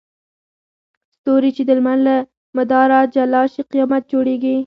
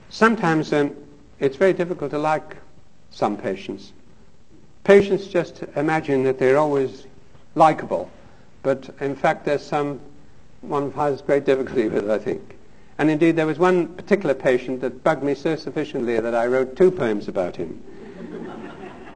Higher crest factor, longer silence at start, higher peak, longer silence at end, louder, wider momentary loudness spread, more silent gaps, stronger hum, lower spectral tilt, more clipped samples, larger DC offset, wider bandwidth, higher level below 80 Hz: about the same, 16 dB vs 20 dB; first, 1.25 s vs 0.1 s; about the same, 0 dBFS vs -2 dBFS; about the same, 0 s vs 0 s; first, -16 LUFS vs -21 LUFS; second, 7 LU vs 16 LU; first, 2.37-2.53 s vs none; neither; about the same, -7.5 dB/octave vs -6.5 dB/octave; neither; second, under 0.1% vs 0.6%; second, 5.6 kHz vs 9.6 kHz; second, -66 dBFS vs -56 dBFS